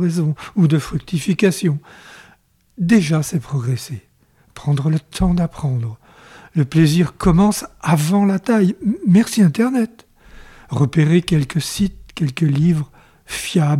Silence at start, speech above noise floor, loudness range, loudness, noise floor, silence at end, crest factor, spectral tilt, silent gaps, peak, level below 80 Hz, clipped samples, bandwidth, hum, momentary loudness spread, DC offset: 0 s; 38 dB; 5 LU; -18 LUFS; -54 dBFS; 0 s; 14 dB; -6.5 dB/octave; none; -4 dBFS; -38 dBFS; under 0.1%; 15 kHz; none; 10 LU; under 0.1%